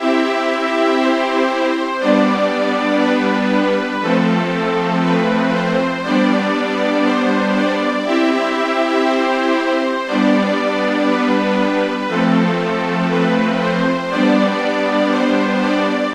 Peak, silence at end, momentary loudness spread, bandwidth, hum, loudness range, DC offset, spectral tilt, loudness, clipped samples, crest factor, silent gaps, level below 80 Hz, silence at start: 0 dBFS; 0 s; 3 LU; 11.5 kHz; none; 0 LU; under 0.1%; -6 dB/octave; -16 LUFS; under 0.1%; 14 dB; none; -64 dBFS; 0 s